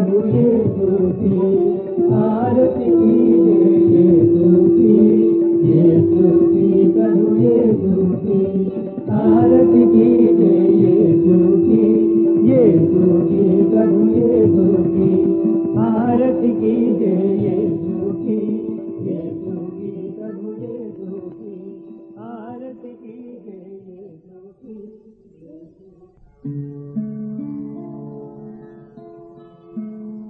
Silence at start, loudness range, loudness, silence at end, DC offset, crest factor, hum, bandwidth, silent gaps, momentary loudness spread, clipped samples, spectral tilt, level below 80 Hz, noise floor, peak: 0 s; 19 LU; -14 LUFS; 0 s; under 0.1%; 14 dB; none; 3 kHz; none; 19 LU; under 0.1%; -14.5 dB/octave; -52 dBFS; -49 dBFS; -2 dBFS